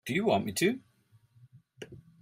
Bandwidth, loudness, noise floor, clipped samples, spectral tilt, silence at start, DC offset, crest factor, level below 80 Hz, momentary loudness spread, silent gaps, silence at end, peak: 16 kHz; -30 LUFS; -65 dBFS; under 0.1%; -4.5 dB/octave; 0.05 s; under 0.1%; 22 dB; -68 dBFS; 21 LU; none; 0.25 s; -12 dBFS